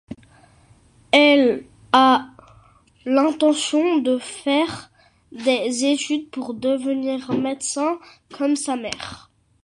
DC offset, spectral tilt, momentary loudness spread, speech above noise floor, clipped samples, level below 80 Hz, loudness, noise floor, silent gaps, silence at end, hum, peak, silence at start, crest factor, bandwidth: under 0.1%; -3 dB/octave; 15 LU; 34 dB; under 0.1%; -60 dBFS; -20 LUFS; -53 dBFS; none; 0.45 s; none; -2 dBFS; 0.1 s; 20 dB; 11.5 kHz